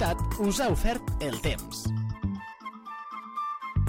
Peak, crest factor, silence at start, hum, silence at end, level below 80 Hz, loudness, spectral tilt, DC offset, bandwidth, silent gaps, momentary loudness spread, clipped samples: -12 dBFS; 16 dB; 0 s; none; 0 s; -36 dBFS; -31 LUFS; -5.5 dB/octave; under 0.1%; 17 kHz; none; 13 LU; under 0.1%